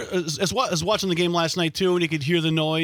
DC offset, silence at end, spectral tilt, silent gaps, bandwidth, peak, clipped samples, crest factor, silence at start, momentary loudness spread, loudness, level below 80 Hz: under 0.1%; 0 s; -4.5 dB/octave; none; 18.5 kHz; -8 dBFS; under 0.1%; 16 dB; 0 s; 2 LU; -22 LUFS; -56 dBFS